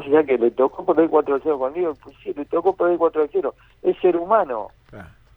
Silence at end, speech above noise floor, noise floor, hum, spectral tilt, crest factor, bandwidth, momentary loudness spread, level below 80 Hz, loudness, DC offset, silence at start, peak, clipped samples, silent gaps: 0.3 s; 23 dB; -43 dBFS; none; -8.5 dB/octave; 16 dB; 4 kHz; 12 LU; -56 dBFS; -20 LUFS; under 0.1%; 0 s; -4 dBFS; under 0.1%; none